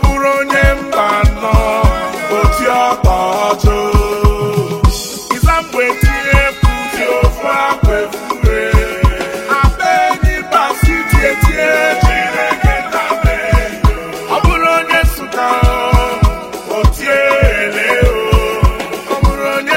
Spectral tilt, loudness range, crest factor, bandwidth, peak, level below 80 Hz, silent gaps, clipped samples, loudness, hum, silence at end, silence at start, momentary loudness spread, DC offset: -5.5 dB/octave; 1 LU; 12 dB; 16.5 kHz; 0 dBFS; -16 dBFS; none; under 0.1%; -13 LUFS; none; 0 s; 0 s; 5 LU; under 0.1%